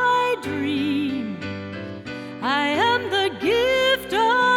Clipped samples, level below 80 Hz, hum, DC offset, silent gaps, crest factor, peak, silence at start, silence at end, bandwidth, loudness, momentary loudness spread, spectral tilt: under 0.1%; -54 dBFS; none; under 0.1%; none; 14 dB; -8 dBFS; 0 s; 0 s; 17.5 kHz; -21 LUFS; 14 LU; -4.5 dB/octave